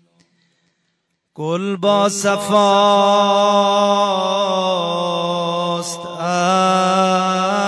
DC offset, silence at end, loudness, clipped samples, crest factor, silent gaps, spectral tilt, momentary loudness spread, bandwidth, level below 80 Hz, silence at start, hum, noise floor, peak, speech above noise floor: under 0.1%; 0 s; -16 LUFS; under 0.1%; 14 dB; none; -4 dB/octave; 9 LU; 11 kHz; -72 dBFS; 1.4 s; none; -69 dBFS; -2 dBFS; 55 dB